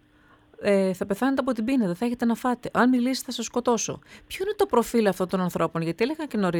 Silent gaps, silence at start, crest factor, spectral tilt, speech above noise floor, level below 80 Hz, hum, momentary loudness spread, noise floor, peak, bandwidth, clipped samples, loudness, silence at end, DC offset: none; 0.6 s; 16 dB; -5 dB/octave; 33 dB; -58 dBFS; none; 7 LU; -57 dBFS; -8 dBFS; 19 kHz; under 0.1%; -25 LUFS; 0 s; under 0.1%